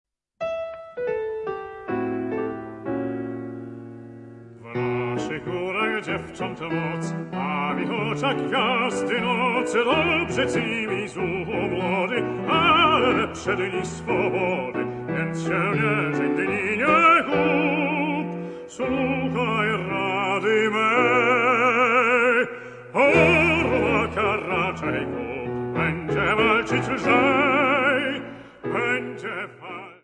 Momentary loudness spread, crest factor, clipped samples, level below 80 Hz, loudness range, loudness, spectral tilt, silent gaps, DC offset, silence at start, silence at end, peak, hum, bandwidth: 13 LU; 18 dB; under 0.1%; -54 dBFS; 10 LU; -22 LUFS; -5.5 dB/octave; none; under 0.1%; 0.4 s; 0.1 s; -4 dBFS; none; 10.5 kHz